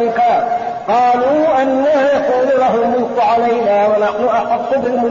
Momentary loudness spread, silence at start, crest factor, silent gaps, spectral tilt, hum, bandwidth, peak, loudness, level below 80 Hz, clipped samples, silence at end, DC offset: 3 LU; 0 s; 8 dB; none; -3.5 dB/octave; none; 7.2 kHz; -6 dBFS; -14 LUFS; -52 dBFS; under 0.1%; 0 s; 0.1%